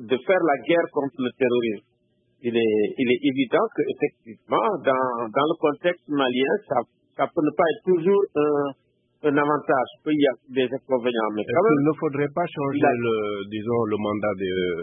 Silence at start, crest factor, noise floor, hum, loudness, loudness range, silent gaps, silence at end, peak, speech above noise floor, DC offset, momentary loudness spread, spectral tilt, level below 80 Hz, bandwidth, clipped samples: 0 s; 18 dB; -64 dBFS; none; -23 LUFS; 1 LU; none; 0 s; -6 dBFS; 42 dB; under 0.1%; 6 LU; -10.5 dB/octave; -68 dBFS; 3.8 kHz; under 0.1%